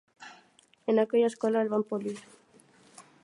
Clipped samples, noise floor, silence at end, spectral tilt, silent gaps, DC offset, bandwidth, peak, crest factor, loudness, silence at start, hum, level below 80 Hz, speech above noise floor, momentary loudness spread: under 0.1%; -62 dBFS; 0.2 s; -6 dB/octave; none; under 0.1%; 11.5 kHz; -14 dBFS; 18 dB; -28 LUFS; 0.2 s; none; -82 dBFS; 35 dB; 24 LU